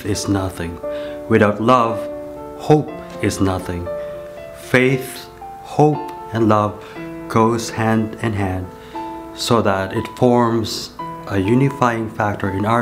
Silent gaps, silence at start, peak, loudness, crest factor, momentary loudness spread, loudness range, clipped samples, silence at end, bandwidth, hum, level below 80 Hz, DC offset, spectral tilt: none; 0 s; 0 dBFS; -18 LUFS; 18 dB; 15 LU; 2 LU; under 0.1%; 0 s; 16 kHz; none; -48 dBFS; under 0.1%; -6 dB/octave